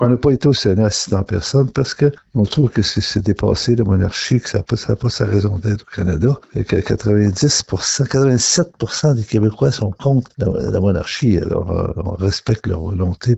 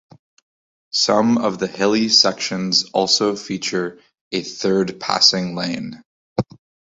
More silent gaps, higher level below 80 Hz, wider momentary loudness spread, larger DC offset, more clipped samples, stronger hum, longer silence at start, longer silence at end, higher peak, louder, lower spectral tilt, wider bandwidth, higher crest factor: second, none vs 4.21-4.31 s, 6.05-6.36 s; first, -38 dBFS vs -58 dBFS; second, 6 LU vs 13 LU; neither; neither; neither; second, 0 s vs 0.95 s; second, 0 s vs 0.45 s; about the same, -2 dBFS vs -2 dBFS; about the same, -17 LUFS vs -18 LUFS; first, -5.5 dB/octave vs -3.5 dB/octave; about the same, 8.2 kHz vs 8 kHz; second, 14 dB vs 20 dB